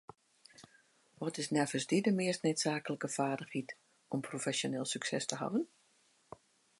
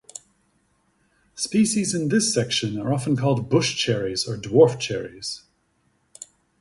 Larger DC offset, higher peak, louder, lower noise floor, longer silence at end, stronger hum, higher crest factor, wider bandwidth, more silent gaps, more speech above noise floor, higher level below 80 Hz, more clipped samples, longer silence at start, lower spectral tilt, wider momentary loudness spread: neither; second, -14 dBFS vs -4 dBFS; second, -36 LUFS vs -22 LUFS; first, -71 dBFS vs -67 dBFS; about the same, 1.15 s vs 1.2 s; neither; about the same, 24 dB vs 20 dB; about the same, 11.5 kHz vs 11.5 kHz; neither; second, 36 dB vs 45 dB; second, -82 dBFS vs -58 dBFS; neither; second, 0.6 s vs 1.35 s; about the same, -4 dB/octave vs -4.5 dB/octave; second, 16 LU vs 23 LU